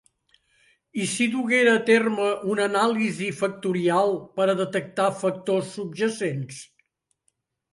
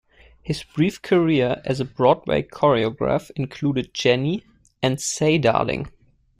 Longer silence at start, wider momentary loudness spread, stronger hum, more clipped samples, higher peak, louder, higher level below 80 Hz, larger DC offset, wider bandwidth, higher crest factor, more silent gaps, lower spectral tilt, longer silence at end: first, 0.95 s vs 0.45 s; about the same, 10 LU vs 11 LU; neither; neither; about the same, -4 dBFS vs -2 dBFS; about the same, -23 LUFS vs -21 LUFS; second, -72 dBFS vs -50 dBFS; neither; second, 11.5 kHz vs 15 kHz; about the same, 20 dB vs 18 dB; neither; about the same, -4.5 dB/octave vs -5.5 dB/octave; first, 1.1 s vs 0.5 s